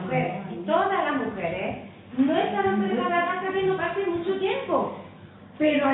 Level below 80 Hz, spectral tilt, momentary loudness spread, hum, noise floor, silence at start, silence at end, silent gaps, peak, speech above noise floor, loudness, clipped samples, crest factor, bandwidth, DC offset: -60 dBFS; -10.5 dB/octave; 10 LU; none; -46 dBFS; 0 s; 0 s; none; -10 dBFS; 22 dB; -26 LUFS; under 0.1%; 16 dB; 4.1 kHz; under 0.1%